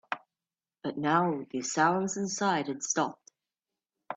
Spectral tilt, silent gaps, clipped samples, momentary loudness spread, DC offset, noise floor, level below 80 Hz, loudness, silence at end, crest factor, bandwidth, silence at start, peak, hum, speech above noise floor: -4 dB/octave; none; under 0.1%; 12 LU; under 0.1%; under -90 dBFS; -76 dBFS; -30 LUFS; 0 s; 20 dB; 9.2 kHz; 0.1 s; -12 dBFS; none; over 61 dB